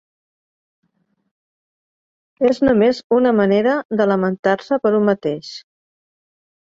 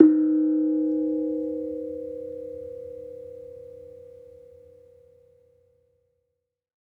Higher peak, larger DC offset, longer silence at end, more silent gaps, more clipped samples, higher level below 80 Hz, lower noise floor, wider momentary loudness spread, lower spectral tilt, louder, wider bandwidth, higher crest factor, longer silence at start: about the same, -2 dBFS vs -2 dBFS; neither; second, 1.15 s vs 2.8 s; first, 3.04-3.10 s, 3.85-3.89 s, 4.39-4.43 s vs none; neither; first, -54 dBFS vs -70 dBFS; second, -67 dBFS vs -81 dBFS; second, 9 LU vs 23 LU; second, -7 dB/octave vs -10.5 dB/octave; first, -17 LUFS vs -26 LUFS; first, 7.6 kHz vs 1.9 kHz; second, 16 dB vs 26 dB; first, 2.4 s vs 0 s